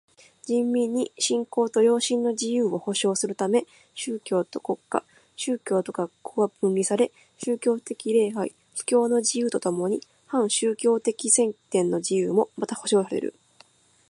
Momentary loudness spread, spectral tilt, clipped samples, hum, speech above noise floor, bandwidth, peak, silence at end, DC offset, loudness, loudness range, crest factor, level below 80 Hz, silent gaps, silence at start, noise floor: 10 LU; -4 dB/octave; under 0.1%; none; 33 dB; 11.5 kHz; -6 dBFS; 0.8 s; under 0.1%; -25 LUFS; 4 LU; 20 dB; -76 dBFS; none; 0.45 s; -58 dBFS